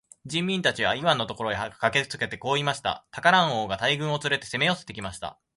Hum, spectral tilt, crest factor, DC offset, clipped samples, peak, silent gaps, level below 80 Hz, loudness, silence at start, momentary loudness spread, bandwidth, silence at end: none; -4 dB/octave; 22 dB; under 0.1%; under 0.1%; -4 dBFS; none; -58 dBFS; -25 LUFS; 0.25 s; 10 LU; 11.5 kHz; 0.25 s